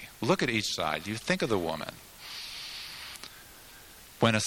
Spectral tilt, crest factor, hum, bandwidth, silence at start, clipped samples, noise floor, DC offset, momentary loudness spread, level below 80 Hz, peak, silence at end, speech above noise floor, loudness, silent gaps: -4 dB/octave; 24 dB; none; 18 kHz; 0 s; under 0.1%; -51 dBFS; under 0.1%; 22 LU; -60 dBFS; -8 dBFS; 0 s; 21 dB; -31 LUFS; none